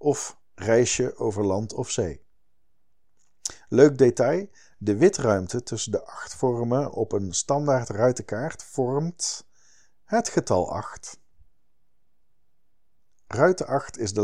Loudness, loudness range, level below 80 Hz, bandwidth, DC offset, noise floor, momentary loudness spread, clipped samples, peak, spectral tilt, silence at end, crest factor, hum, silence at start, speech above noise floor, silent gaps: -24 LUFS; 7 LU; -56 dBFS; 11.5 kHz; 0.4%; -76 dBFS; 14 LU; under 0.1%; -2 dBFS; -5 dB/octave; 0 s; 22 dB; none; 0 s; 53 dB; none